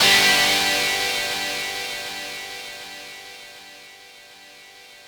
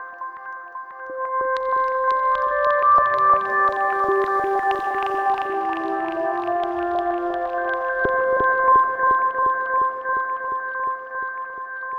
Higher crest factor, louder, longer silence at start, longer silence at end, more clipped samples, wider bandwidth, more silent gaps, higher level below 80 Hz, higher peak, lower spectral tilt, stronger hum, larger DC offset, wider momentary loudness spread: about the same, 18 dB vs 14 dB; about the same, -20 LUFS vs -21 LUFS; about the same, 0 s vs 0 s; about the same, 0 s vs 0 s; neither; first, over 20 kHz vs 7 kHz; neither; about the same, -56 dBFS vs -56 dBFS; about the same, -6 dBFS vs -6 dBFS; second, 0 dB/octave vs -5.5 dB/octave; neither; neither; first, 25 LU vs 14 LU